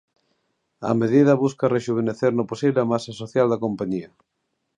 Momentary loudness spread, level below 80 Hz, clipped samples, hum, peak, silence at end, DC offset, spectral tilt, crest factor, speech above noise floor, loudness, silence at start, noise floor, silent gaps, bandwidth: 10 LU; -64 dBFS; under 0.1%; none; -4 dBFS; 0.7 s; under 0.1%; -7.5 dB/octave; 18 dB; 51 dB; -22 LUFS; 0.8 s; -72 dBFS; none; 10 kHz